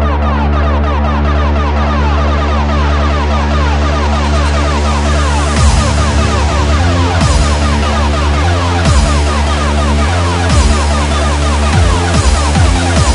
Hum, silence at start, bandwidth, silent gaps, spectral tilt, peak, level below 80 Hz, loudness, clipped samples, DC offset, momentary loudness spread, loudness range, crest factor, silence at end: none; 0 s; 11 kHz; none; -5 dB/octave; 0 dBFS; -12 dBFS; -12 LUFS; under 0.1%; under 0.1%; 2 LU; 1 LU; 10 dB; 0 s